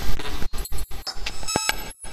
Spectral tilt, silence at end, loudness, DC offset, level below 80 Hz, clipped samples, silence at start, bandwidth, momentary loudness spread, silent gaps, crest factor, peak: -2.5 dB/octave; 0 s; -28 LUFS; under 0.1%; -30 dBFS; under 0.1%; 0 s; 15 kHz; 10 LU; none; 20 dB; 0 dBFS